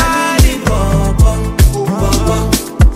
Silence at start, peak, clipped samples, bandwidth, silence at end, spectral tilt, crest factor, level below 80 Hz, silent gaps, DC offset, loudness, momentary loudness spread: 0 s; 0 dBFS; under 0.1%; 16 kHz; 0 s; -5 dB/octave; 10 dB; -14 dBFS; none; under 0.1%; -13 LUFS; 3 LU